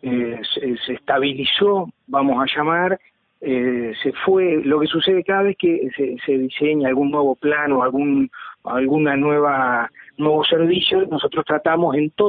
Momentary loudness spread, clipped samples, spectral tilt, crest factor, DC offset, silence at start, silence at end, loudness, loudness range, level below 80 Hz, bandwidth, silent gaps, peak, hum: 7 LU; under 0.1%; -10.5 dB/octave; 16 dB; under 0.1%; 0 s; 0 s; -19 LUFS; 2 LU; -60 dBFS; 4.7 kHz; none; -2 dBFS; none